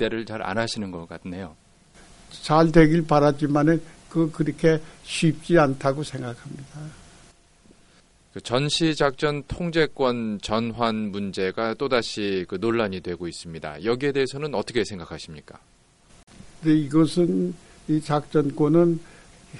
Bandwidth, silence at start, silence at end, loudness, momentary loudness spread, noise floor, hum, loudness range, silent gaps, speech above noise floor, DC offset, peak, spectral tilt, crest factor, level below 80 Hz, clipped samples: 11.5 kHz; 0 s; 0 s; -23 LUFS; 17 LU; -57 dBFS; none; 7 LU; 16.23-16.27 s; 34 dB; under 0.1%; 0 dBFS; -6 dB/octave; 24 dB; -48 dBFS; under 0.1%